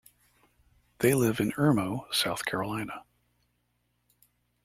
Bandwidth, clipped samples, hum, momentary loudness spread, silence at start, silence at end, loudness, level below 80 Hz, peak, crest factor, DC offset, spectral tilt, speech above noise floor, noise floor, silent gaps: 16.5 kHz; under 0.1%; 60 Hz at -55 dBFS; 11 LU; 1 s; 1.65 s; -28 LUFS; -62 dBFS; -10 dBFS; 22 dB; under 0.1%; -5 dB/octave; 47 dB; -75 dBFS; none